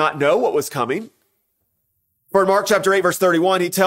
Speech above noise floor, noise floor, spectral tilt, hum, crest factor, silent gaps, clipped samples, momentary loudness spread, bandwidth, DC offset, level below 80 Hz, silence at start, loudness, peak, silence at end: 53 dB; -70 dBFS; -4 dB/octave; none; 16 dB; none; under 0.1%; 7 LU; 16.5 kHz; under 0.1%; -66 dBFS; 0 s; -18 LUFS; -2 dBFS; 0 s